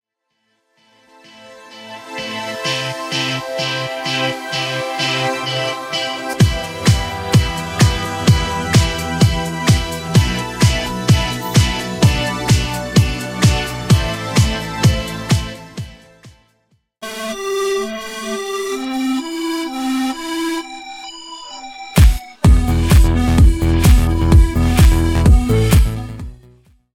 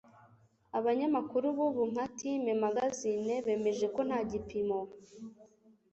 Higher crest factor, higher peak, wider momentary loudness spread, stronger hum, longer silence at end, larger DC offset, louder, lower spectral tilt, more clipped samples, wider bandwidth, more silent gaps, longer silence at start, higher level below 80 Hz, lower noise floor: about the same, 16 dB vs 16 dB; first, 0 dBFS vs -18 dBFS; first, 16 LU vs 10 LU; neither; about the same, 0.6 s vs 0.5 s; neither; first, -16 LUFS vs -33 LUFS; about the same, -5 dB/octave vs -5.5 dB/octave; neither; first, 16.5 kHz vs 8.2 kHz; neither; first, 1.4 s vs 0.75 s; first, -20 dBFS vs -66 dBFS; first, -69 dBFS vs -64 dBFS